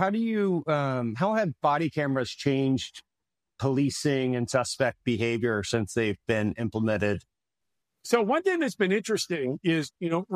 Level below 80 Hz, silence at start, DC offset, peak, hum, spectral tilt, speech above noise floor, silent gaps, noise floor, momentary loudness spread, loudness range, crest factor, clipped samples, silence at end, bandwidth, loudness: -62 dBFS; 0 s; under 0.1%; -10 dBFS; none; -5.5 dB/octave; 62 dB; none; -88 dBFS; 4 LU; 1 LU; 18 dB; under 0.1%; 0 s; 15 kHz; -27 LUFS